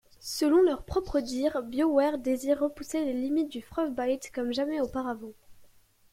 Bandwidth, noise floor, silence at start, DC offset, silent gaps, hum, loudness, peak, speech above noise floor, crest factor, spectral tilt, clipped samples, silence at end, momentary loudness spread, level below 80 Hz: 16.5 kHz; -59 dBFS; 0.2 s; under 0.1%; none; none; -29 LUFS; -12 dBFS; 31 dB; 16 dB; -4.5 dB/octave; under 0.1%; 0.45 s; 9 LU; -52 dBFS